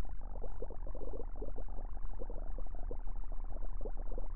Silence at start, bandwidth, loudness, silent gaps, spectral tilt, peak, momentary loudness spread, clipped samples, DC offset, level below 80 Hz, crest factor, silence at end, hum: 0 s; 2 kHz; -48 LUFS; none; -11 dB/octave; -24 dBFS; 2 LU; under 0.1%; 2%; -40 dBFS; 8 dB; 0 s; none